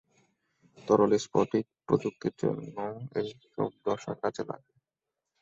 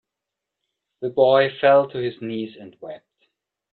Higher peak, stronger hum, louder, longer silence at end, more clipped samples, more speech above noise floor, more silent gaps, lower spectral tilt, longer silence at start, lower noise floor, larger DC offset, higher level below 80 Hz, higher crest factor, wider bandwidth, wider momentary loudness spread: second, -10 dBFS vs -4 dBFS; neither; second, -31 LUFS vs -19 LUFS; about the same, 0.85 s vs 0.75 s; neither; second, 58 dB vs 64 dB; neither; second, -6.5 dB/octave vs -8.5 dB/octave; second, 0.8 s vs 1 s; first, -88 dBFS vs -84 dBFS; neither; about the same, -68 dBFS vs -68 dBFS; about the same, 22 dB vs 20 dB; first, 7.8 kHz vs 4.5 kHz; second, 13 LU vs 22 LU